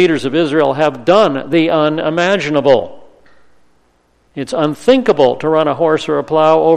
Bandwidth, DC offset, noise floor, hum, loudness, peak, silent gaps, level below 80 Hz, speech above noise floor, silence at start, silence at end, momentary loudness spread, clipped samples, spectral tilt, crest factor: 10.5 kHz; under 0.1%; -55 dBFS; none; -13 LUFS; 0 dBFS; none; -50 dBFS; 43 dB; 0 s; 0 s; 6 LU; under 0.1%; -6 dB/octave; 14 dB